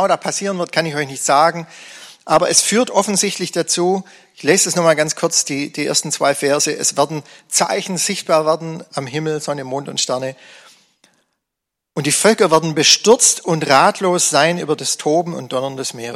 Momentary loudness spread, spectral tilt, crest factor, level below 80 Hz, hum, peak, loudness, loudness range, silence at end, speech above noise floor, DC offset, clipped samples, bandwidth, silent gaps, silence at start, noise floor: 11 LU; -2.5 dB/octave; 18 dB; -64 dBFS; none; 0 dBFS; -16 LUFS; 7 LU; 0 s; 64 dB; under 0.1%; under 0.1%; 16 kHz; none; 0 s; -81 dBFS